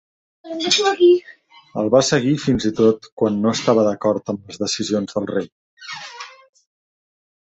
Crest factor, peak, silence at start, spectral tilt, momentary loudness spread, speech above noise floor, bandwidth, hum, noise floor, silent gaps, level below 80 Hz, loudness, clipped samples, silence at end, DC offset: 18 dB; -2 dBFS; 0.45 s; -4.5 dB/octave; 18 LU; 19 dB; 8.2 kHz; none; -37 dBFS; 3.12-3.17 s, 5.52-5.77 s; -54 dBFS; -18 LUFS; under 0.1%; 1.15 s; under 0.1%